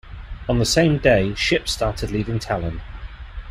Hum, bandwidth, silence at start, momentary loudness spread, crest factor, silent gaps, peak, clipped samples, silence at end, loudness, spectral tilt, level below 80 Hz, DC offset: none; 15 kHz; 0.05 s; 21 LU; 18 dB; none; -2 dBFS; under 0.1%; 0 s; -20 LUFS; -5 dB/octave; -34 dBFS; under 0.1%